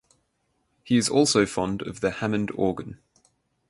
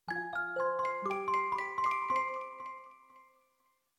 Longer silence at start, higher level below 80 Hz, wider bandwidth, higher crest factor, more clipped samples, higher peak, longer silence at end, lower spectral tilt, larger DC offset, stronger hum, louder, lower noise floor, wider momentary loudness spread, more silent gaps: first, 0.85 s vs 0.05 s; first, -54 dBFS vs -76 dBFS; second, 11.5 kHz vs 13 kHz; about the same, 20 dB vs 16 dB; neither; first, -6 dBFS vs -22 dBFS; about the same, 0.75 s vs 0.75 s; about the same, -4.5 dB/octave vs -4.5 dB/octave; neither; neither; first, -24 LUFS vs -34 LUFS; about the same, -73 dBFS vs -76 dBFS; second, 9 LU vs 12 LU; neither